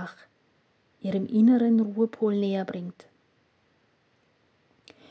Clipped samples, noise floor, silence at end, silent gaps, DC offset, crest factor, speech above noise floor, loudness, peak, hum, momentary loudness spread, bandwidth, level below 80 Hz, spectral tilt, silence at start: under 0.1%; -67 dBFS; 2.2 s; none; under 0.1%; 16 dB; 43 dB; -25 LUFS; -12 dBFS; none; 17 LU; 5.8 kHz; -78 dBFS; -9 dB/octave; 0 s